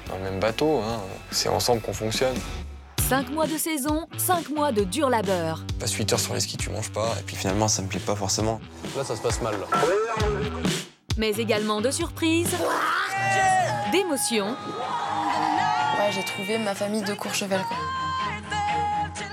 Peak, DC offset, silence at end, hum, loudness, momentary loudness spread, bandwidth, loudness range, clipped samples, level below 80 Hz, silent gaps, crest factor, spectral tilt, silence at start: -8 dBFS; under 0.1%; 0 s; none; -25 LUFS; 6 LU; 17.5 kHz; 3 LU; under 0.1%; -44 dBFS; none; 18 dB; -3.5 dB/octave; 0 s